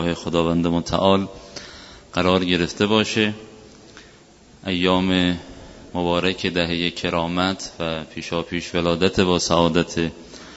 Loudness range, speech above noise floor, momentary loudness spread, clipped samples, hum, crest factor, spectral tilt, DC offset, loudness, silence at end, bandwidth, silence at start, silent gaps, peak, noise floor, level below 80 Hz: 3 LU; 28 dB; 15 LU; under 0.1%; none; 22 dB; -5 dB/octave; under 0.1%; -21 LUFS; 0 s; 8 kHz; 0 s; none; 0 dBFS; -49 dBFS; -46 dBFS